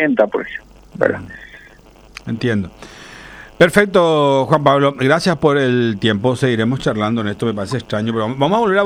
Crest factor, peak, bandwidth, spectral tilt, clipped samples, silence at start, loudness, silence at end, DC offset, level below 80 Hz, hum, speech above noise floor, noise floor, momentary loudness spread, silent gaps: 16 dB; 0 dBFS; 16 kHz; -6 dB/octave; under 0.1%; 0 s; -16 LUFS; 0 s; under 0.1%; -46 dBFS; none; 28 dB; -44 dBFS; 20 LU; none